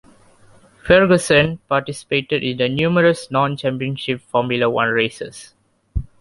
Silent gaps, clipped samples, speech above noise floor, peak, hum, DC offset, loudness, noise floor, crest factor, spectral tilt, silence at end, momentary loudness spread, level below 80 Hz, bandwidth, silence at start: none; under 0.1%; 32 dB; -2 dBFS; none; under 0.1%; -18 LUFS; -49 dBFS; 18 dB; -5.5 dB/octave; 0.15 s; 16 LU; -40 dBFS; 11.5 kHz; 0.85 s